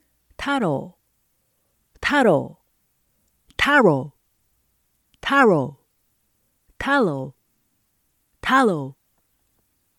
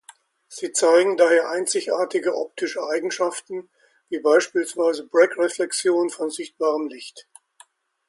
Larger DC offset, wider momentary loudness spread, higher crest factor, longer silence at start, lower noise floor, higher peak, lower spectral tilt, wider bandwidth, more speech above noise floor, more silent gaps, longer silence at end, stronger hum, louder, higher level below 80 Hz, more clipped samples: neither; first, 19 LU vs 15 LU; about the same, 20 dB vs 18 dB; about the same, 0.4 s vs 0.5 s; first, -69 dBFS vs -55 dBFS; about the same, -4 dBFS vs -4 dBFS; first, -5.5 dB/octave vs -2 dB/octave; first, 16.5 kHz vs 11.5 kHz; first, 50 dB vs 34 dB; neither; first, 1.05 s vs 0.85 s; neither; about the same, -20 LUFS vs -21 LUFS; first, -54 dBFS vs -78 dBFS; neither